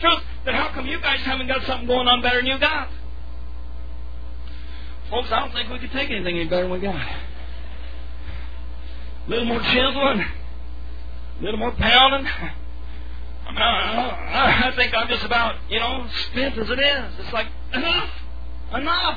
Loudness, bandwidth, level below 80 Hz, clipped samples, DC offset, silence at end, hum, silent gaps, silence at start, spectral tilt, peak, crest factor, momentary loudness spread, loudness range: -21 LUFS; 5 kHz; -34 dBFS; under 0.1%; 4%; 0 s; none; none; 0 s; -6 dB/octave; -2 dBFS; 20 dB; 20 LU; 8 LU